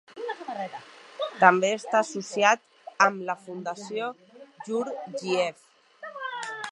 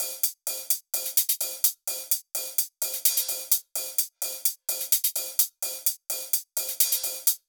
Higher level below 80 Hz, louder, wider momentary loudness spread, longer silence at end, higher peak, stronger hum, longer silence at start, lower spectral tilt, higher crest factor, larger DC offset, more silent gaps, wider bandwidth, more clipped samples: first, -84 dBFS vs under -90 dBFS; about the same, -26 LUFS vs -25 LUFS; first, 18 LU vs 5 LU; about the same, 0 s vs 0.1 s; first, -2 dBFS vs -6 dBFS; neither; about the same, 0.1 s vs 0 s; first, -3.5 dB/octave vs 4.5 dB/octave; about the same, 26 dB vs 22 dB; neither; neither; second, 11.5 kHz vs over 20 kHz; neither